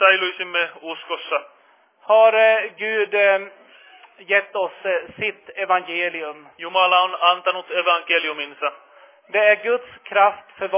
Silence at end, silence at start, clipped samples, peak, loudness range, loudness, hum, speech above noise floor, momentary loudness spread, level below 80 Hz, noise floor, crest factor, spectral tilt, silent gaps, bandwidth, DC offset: 0 s; 0 s; under 0.1%; -2 dBFS; 3 LU; -19 LUFS; none; 28 dB; 12 LU; -74 dBFS; -48 dBFS; 18 dB; -5.5 dB/octave; none; 3.8 kHz; under 0.1%